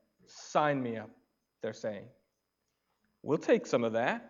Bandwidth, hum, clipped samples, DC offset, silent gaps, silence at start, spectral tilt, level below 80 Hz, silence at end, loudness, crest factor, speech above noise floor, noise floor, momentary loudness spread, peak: 7.6 kHz; none; under 0.1%; under 0.1%; none; 0.3 s; -5.5 dB/octave; -82 dBFS; 0 s; -32 LUFS; 22 dB; 51 dB; -83 dBFS; 18 LU; -14 dBFS